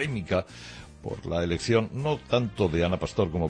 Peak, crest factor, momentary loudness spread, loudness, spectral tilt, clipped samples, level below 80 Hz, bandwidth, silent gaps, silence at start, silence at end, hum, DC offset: -10 dBFS; 18 dB; 15 LU; -27 LUFS; -6 dB/octave; under 0.1%; -46 dBFS; 10 kHz; none; 0 s; 0 s; none; under 0.1%